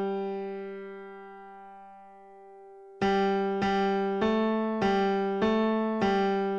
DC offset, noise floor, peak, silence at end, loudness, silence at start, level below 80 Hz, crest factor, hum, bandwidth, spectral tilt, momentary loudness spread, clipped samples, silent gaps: under 0.1%; -51 dBFS; -14 dBFS; 0 s; -28 LUFS; 0 s; -58 dBFS; 16 dB; none; 7.6 kHz; -7 dB/octave; 20 LU; under 0.1%; none